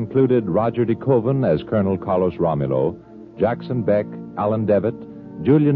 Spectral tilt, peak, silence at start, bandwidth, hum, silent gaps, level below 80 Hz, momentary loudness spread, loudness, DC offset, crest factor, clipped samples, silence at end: -11.5 dB/octave; -4 dBFS; 0 s; 4.7 kHz; none; none; -50 dBFS; 8 LU; -20 LUFS; under 0.1%; 16 dB; under 0.1%; 0 s